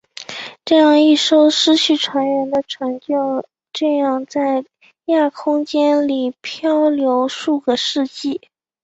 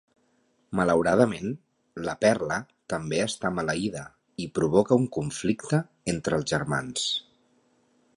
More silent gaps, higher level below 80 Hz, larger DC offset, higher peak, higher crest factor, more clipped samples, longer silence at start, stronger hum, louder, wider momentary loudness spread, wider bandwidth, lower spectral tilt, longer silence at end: neither; second, -64 dBFS vs -56 dBFS; neither; first, -2 dBFS vs -6 dBFS; second, 16 dB vs 22 dB; neither; second, 0.2 s vs 0.7 s; neither; first, -16 LUFS vs -27 LUFS; about the same, 13 LU vs 12 LU; second, 8 kHz vs 11.5 kHz; second, -2.5 dB/octave vs -5 dB/octave; second, 0.45 s vs 0.95 s